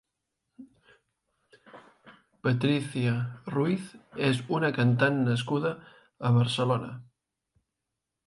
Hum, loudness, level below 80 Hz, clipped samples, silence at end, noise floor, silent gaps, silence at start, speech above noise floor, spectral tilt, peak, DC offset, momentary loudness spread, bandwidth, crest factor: none; -28 LUFS; -68 dBFS; under 0.1%; 1.25 s; -85 dBFS; none; 0.6 s; 59 dB; -7 dB/octave; -10 dBFS; under 0.1%; 9 LU; 11.5 kHz; 20 dB